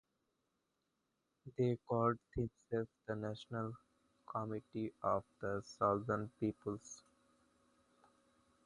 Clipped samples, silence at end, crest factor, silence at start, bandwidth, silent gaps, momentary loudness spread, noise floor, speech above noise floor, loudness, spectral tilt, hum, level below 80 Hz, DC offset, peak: under 0.1%; 1.65 s; 22 dB; 1.45 s; 11 kHz; none; 12 LU; -86 dBFS; 45 dB; -41 LUFS; -7 dB/octave; none; -66 dBFS; under 0.1%; -20 dBFS